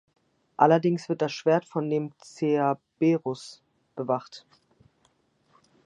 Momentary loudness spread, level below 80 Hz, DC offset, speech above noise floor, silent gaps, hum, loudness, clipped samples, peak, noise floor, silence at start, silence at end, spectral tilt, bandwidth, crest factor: 22 LU; -78 dBFS; under 0.1%; 43 dB; none; none; -26 LUFS; under 0.1%; -6 dBFS; -68 dBFS; 0.6 s; 1.45 s; -7 dB/octave; 9.6 kHz; 22 dB